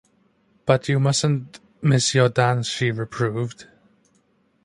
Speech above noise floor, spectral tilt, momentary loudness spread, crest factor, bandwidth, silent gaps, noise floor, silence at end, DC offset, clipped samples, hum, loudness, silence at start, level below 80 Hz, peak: 43 dB; -5 dB/octave; 11 LU; 20 dB; 11.5 kHz; none; -63 dBFS; 1 s; under 0.1%; under 0.1%; none; -21 LUFS; 0.65 s; -58 dBFS; -4 dBFS